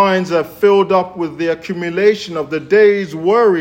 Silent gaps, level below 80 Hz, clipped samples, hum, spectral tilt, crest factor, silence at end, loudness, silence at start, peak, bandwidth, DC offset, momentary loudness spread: none; -58 dBFS; under 0.1%; none; -6 dB/octave; 14 dB; 0 s; -15 LUFS; 0 s; 0 dBFS; 16 kHz; under 0.1%; 10 LU